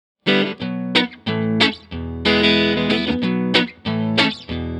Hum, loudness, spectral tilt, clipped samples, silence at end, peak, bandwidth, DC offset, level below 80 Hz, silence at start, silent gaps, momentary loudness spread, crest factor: none; -18 LUFS; -5.5 dB/octave; under 0.1%; 0 s; 0 dBFS; 11 kHz; under 0.1%; -42 dBFS; 0.25 s; none; 8 LU; 20 dB